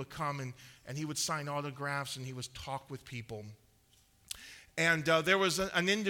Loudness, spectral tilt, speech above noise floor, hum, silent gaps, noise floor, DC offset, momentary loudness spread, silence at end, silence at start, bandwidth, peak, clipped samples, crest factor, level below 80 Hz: -34 LUFS; -3.5 dB/octave; 33 dB; none; none; -67 dBFS; under 0.1%; 17 LU; 0 s; 0 s; 18.5 kHz; -14 dBFS; under 0.1%; 22 dB; -64 dBFS